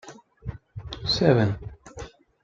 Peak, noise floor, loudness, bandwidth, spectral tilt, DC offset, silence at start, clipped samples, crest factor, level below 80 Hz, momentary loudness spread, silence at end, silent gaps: -4 dBFS; -43 dBFS; -23 LUFS; 7.8 kHz; -6 dB/octave; under 0.1%; 0.05 s; under 0.1%; 22 dB; -46 dBFS; 22 LU; 0.35 s; none